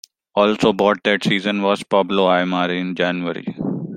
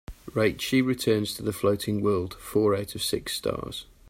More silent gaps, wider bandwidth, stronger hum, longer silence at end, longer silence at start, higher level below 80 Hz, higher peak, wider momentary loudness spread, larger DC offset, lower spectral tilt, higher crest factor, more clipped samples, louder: neither; second, 12 kHz vs 16 kHz; neither; second, 0 s vs 0.25 s; first, 0.35 s vs 0.1 s; second, -58 dBFS vs -52 dBFS; first, -2 dBFS vs -10 dBFS; first, 9 LU vs 6 LU; neither; about the same, -5.5 dB/octave vs -5 dB/octave; about the same, 18 dB vs 16 dB; neither; first, -18 LUFS vs -27 LUFS